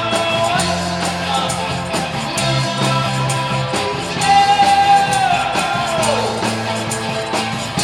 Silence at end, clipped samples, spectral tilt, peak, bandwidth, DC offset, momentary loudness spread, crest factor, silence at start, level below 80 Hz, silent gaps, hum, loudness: 0 s; under 0.1%; -3.5 dB/octave; -2 dBFS; 17 kHz; under 0.1%; 8 LU; 16 dB; 0 s; -44 dBFS; none; none; -16 LUFS